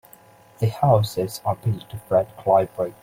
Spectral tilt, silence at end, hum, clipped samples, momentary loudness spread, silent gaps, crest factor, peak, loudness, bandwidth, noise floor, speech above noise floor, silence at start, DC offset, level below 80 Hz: -7 dB/octave; 0.1 s; none; under 0.1%; 8 LU; none; 20 dB; -4 dBFS; -22 LUFS; 16.5 kHz; -50 dBFS; 29 dB; 0.6 s; under 0.1%; -54 dBFS